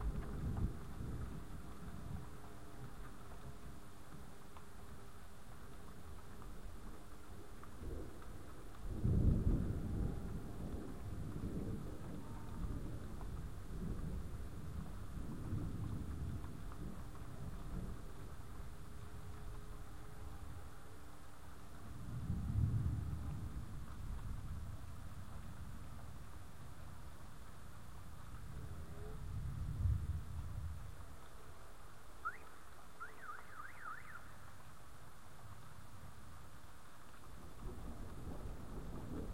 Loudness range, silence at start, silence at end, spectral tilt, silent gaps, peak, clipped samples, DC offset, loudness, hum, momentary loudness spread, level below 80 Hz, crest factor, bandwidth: 14 LU; 0 s; 0 s; -7 dB/octave; none; -22 dBFS; under 0.1%; 0.4%; -48 LUFS; none; 15 LU; -50 dBFS; 24 dB; 16 kHz